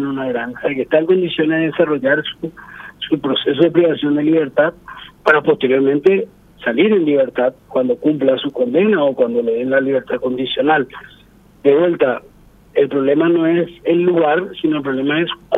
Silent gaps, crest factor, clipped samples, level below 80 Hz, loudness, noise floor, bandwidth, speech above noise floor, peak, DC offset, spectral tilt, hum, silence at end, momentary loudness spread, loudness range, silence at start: none; 16 dB; under 0.1%; -56 dBFS; -16 LUFS; -47 dBFS; 4.7 kHz; 32 dB; 0 dBFS; under 0.1%; -8 dB/octave; none; 0 s; 8 LU; 2 LU; 0 s